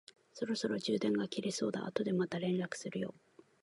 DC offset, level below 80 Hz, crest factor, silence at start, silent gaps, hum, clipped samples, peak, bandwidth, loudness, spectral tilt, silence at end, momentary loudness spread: under 0.1%; -78 dBFS; 20 dB; 0.35 s; none; none; under 0.1%; -18 dBFS; 11.5 kHz; -37 LUFS; -5.5 dB/octave; 0.5 s; 8 LU